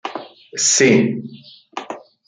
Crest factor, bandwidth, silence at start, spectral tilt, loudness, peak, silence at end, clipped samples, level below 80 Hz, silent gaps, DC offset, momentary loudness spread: 18 dB; 10 kHz; 0.05 s; -3 dB/octave; -14 LUFS; -2 dBFS; 0.3 s; under 0.1%; -64 dBFS; none; under 0.1%; 22 LU